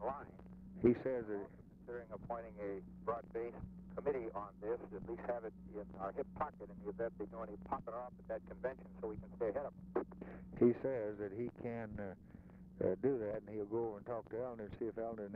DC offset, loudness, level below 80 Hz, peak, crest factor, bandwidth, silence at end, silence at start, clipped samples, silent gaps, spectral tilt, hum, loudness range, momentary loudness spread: under 0.1%; -43 LUFS; -62 dBFS; -18 dBFS; 24 dB; 4.4 kHz; 0 s; 0 s; under 0.1%; none; -9 dB/octave; none; 5 LU; 14 LU